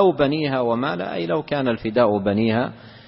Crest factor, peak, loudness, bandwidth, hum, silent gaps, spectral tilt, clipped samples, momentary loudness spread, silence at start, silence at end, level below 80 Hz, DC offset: 16 dB; -4 dBFS; -21 LUFS; 5.8 kHz; none; none; -11.5 dB/octave; under 0.1%; 6 LU; 0 s; 0.1 s; -52 dBFS; under 0.1%